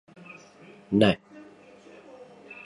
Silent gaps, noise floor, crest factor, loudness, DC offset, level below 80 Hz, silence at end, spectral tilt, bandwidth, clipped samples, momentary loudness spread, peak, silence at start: none; -51 dBFS; 24 dB; -24 LUFS; under 0.1%; -60 dBFS; 0.1 s; -7 dB/octave; 10.5 kHz; under 0.1%; 27 LU; -6 dBFS; 0.9 s